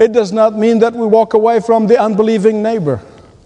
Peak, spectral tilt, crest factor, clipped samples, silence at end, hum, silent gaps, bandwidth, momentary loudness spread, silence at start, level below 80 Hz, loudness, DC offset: 0 dBFS; -7 dB/octave; 12 dB; 0.2%; 0.45 s; none; none; 9.8 kHz; 5 LU; 0 s; -54 dBFS; -12 LUFS; under 0.1%